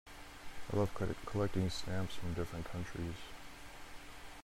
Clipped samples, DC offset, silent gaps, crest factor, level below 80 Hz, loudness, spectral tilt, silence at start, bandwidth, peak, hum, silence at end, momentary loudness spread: under 0.1%; under 0.1%; none; 18 dB; -54 dBFS; -40 LUFS; -6 dB/octave; 0.05 s; 16 kHz; -22 dBFS; none; 0 s; 16 LU